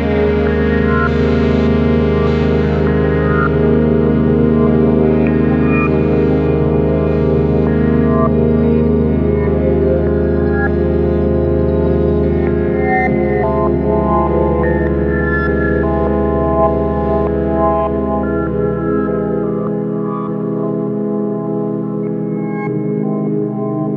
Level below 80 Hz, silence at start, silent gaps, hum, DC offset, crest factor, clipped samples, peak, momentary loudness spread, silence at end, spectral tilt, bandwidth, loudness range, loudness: -24 dBFS; 0 s; none; none; under 0.1%; 12 dB; under 0.1%; -2 dBFS; 6 LU; 0 s; -10.5 dB/octave; 5.4 kHz; 5 LU; -14 LUFS